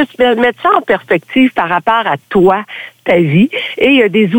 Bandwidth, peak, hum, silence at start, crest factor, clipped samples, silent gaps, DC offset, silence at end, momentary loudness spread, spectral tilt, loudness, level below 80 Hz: 17.5 kHz; 0 dBFS; none; 0 s; 12 dB; under 0.1%; none; under 0.1%; 0 s; 5 LU; -7.5 dB/octave; -11 LUFS; -48 dBFS